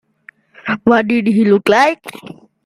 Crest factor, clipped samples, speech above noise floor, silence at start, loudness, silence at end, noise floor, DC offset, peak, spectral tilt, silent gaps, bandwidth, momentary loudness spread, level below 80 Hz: 14 dB; under 0.1%; 33 dB; 0.65 s; -13 LUFS; 0.35 s; -46 dBFS; under 0.1%; 0 dBFS; -6 dB/octave; none; 13.5 kHz; 17 LU; -56 dBFS